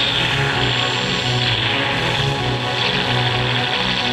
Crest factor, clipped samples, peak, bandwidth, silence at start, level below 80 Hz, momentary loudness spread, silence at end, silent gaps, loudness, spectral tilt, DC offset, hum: 14 dB; under 0.1%; -6 dBFS; 13 kHz; 0 s; -40 dBFS; 2 LU; 0 s; none; -17 LUFS; -4 dB/octave; under 0.1%; none